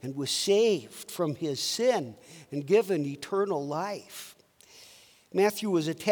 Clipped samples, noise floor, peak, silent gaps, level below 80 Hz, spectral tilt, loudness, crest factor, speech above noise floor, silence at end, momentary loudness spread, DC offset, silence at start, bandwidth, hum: under 0.1%; -56 dBFS; -10 dBFS; none; -78 dBFS; -4 dB/octave; -28 LUFS; 20 dB; 28 dB; 0 s; 15 LU; under 0.1%; 0.05 s; over 20 kHz; none